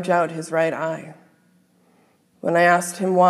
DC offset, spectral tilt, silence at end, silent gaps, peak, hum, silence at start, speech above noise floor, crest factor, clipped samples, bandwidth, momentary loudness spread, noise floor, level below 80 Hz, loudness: under 0.1%; -5 dB/octave; 0 s; none; -4 dBFS; none; 0 s; 40 dB; 18 dB; under 0.1%; 14.5 kHz; 14 LU; -59 dBFS; -82 dBFS; -21 LUFS